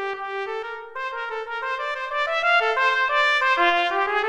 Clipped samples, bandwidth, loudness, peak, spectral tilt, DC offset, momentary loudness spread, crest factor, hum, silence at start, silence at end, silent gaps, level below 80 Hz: under 0.1%; 11 kHz; -22 LUFS; -6 dBFS; -1 dB/octave; under 0.1%; 12 LU; 16 dB; none; 0 s; 0 s; none; -62 dBFS